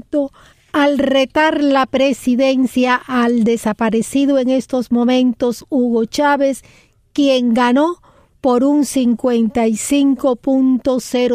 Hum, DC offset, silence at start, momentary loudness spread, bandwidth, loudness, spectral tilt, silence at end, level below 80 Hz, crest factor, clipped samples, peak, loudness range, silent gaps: none; under 0.1%; 0.15 s; 5 LU; 15.5 kHz; -15 LUFS; -4.5 dB/octave; 0 s; -50 dBFS; 12 dB; under 0.1%; -2 dBFS; 1 LU; none